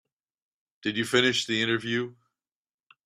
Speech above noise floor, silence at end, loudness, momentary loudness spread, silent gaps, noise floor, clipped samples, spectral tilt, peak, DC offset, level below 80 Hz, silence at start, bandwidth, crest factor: 56 dB; 0.95 s; -26 LUFS; 10 LU; none; -82 dBFS; under 0.1%; -3.5 dB/octave; -8 dBFS; under 0.1%; -68 dBFS; 0.85 s; 14.5 kHz; 22 dB